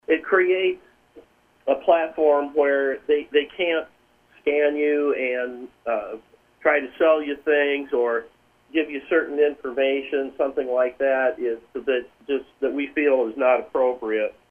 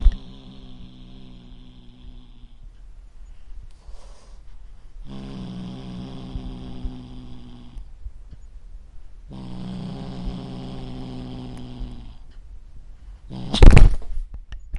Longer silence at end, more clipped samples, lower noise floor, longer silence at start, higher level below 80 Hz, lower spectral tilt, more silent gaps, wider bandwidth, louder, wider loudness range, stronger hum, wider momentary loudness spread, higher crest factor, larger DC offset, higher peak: first, 0.2 s vs 0 s; neither; first, -57 dBFS vs -43 dBFS; about the same, 0.1 s vs 0 s; second, -64 dBFS vs -24 dBFS; about the same, -5.5 dB/octave vs -6.5 dB/octave; neither; second, 3.6 kHz vs 10.5 kHz; about the same, -23 LUFS vs -25 LUFS; second, 2 LU vs 25 LU; neither; second, 9 LU vs 21 LU; about the same, 18 dB vs 22 dB; neither; second, -4 dBFS vs 0 dBFS